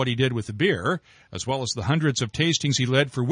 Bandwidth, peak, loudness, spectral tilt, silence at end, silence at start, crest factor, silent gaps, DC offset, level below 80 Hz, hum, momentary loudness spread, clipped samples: 10.5 kHz; -8 dBFS; -24 LUFS; -4.5 dB/octave; 0 s; 0 s; 16 dB; none; under 0.1%; -56 dBFS; none; 8 LU; under 0.1%